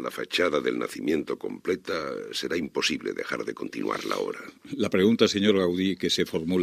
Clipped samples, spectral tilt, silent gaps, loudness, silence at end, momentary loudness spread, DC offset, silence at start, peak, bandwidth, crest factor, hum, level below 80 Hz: under 0.1%; -4.5 dB/octave; none; -27 LUFS; 0 s; 10 LU; under 0.1%; 0 s; -6 dBFS; 15.5 kHz; 20 dB; none; -66 dBFS